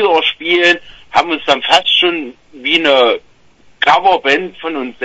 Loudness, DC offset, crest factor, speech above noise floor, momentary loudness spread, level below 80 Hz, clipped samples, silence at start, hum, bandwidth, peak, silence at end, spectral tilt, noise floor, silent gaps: -12 LUFS; under 0.1%; 14 dB; 33 dB; 12 LU; -52 dBFS; under 0.1%; 0 s; none; 11 kHz; 0 dBFS; 0 s; -2.5 dB/octave; -46 dBFS; none